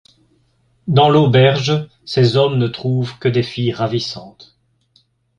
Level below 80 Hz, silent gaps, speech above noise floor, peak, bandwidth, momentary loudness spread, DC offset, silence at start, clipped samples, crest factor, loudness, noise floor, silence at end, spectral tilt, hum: -52 dBFS; none; 44 dB; -2 dBFS; 7.4 kHz; 11 LU; under 0.1%; 0.85 s; under 0.1%; 16 dB; -16 LUFS; -59 dBFS; 1.1 s; -7 dB/octave; none